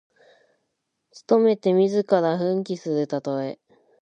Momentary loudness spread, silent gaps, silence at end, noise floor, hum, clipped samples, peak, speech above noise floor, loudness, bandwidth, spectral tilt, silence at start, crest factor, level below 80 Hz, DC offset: 10 LU; none; 0.45 s; -77 dBFS; none; under 0.1%; -6 dBFS; 55 dB; -22 LUFS; 8.8 kHz; -7.5 dB/octave; 1.15 s; 18 dB; -78 dBFS; under 0.1%